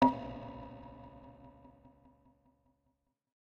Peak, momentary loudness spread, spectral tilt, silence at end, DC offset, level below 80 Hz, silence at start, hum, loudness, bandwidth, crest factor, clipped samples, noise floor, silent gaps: -12 dBFS; 19 LU; -7.5 dB/octave; 1.8 s; under 0.1%; -62 dBFS; 0 s; none; -40 LUFS; 6.6 kHz; 26 dB; under 0.1%; -81 dBFS; none